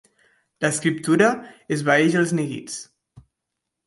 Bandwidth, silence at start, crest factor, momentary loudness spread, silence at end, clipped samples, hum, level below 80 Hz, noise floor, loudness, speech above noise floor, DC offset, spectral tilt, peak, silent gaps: 11.5 kHz; 0.6 s; 18 dB; 14 LU; 0.65 s; under 0.1%; none; -66 dBFS; -82 dBFS; -21 LUFS; 61 dB; under 0.1%; -5 dB/octave; -4 dBFS; none